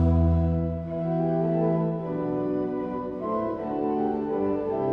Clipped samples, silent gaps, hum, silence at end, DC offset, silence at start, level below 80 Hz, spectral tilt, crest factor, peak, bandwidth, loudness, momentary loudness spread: under 0.1%; none; none; 0 s; under 0.1%; 0 s; -38 dBFS; -11.5 dB/octave; 14 dB; -12 dBFS; 4.2 kHz; -27 LUFS; 6 LU